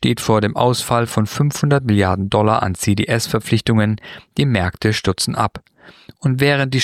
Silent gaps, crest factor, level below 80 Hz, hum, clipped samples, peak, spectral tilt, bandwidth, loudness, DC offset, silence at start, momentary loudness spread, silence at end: none; 16 dB; -44 dBFS; none; under 0.1%; -2 dBFS; -5.5 dB/octave; 15.5 kHz; -17 LUFS; under 0.1%; 0 s; 5 LU; 0 s